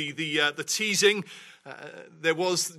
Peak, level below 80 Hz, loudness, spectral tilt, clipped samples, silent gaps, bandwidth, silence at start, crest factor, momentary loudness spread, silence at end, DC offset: -8 dBFS; -78 dBFS; -25 LUFS; -2 dB/octave; under 0.1%; none; 15.5 kHz; 0 s; 20 dB; 22 LU; 0 s; under 0.1%